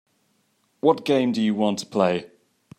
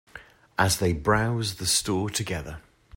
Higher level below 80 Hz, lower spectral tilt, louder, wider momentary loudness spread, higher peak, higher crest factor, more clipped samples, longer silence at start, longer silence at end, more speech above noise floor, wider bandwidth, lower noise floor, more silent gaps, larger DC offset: second, -72 dBFS vs -46 dBFS; first, -6 dB/octave vs -3.5 dB/octave; first, -22 LUFS vs -25 LUFS; second, 4 LU vs 12 LU; about the same, -4 dBFS vs -6 dBFS; about the same, 20 dB vs 22 dB; neither; first, 0.85 s vs 0.15 s; first, 0.5 s vs 0.35 s; first, 46 dB vs 23 dB; second, 13 kHz vs 16.5 kHz; first, -68 dBFS vs -49 dBFS; neither; neither